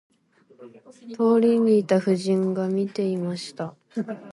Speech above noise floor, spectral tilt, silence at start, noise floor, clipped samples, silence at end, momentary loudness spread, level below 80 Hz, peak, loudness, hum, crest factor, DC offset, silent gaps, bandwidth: 35 dB; -7 dB/octave; 0.6 s; -58 dBFS; under 0.1%; 0.05 s; 14 LU; -72 dBFS; -8 dBFS; -23 LUFS; none; 16 dB; under 0.1%; none; 11.5 kHz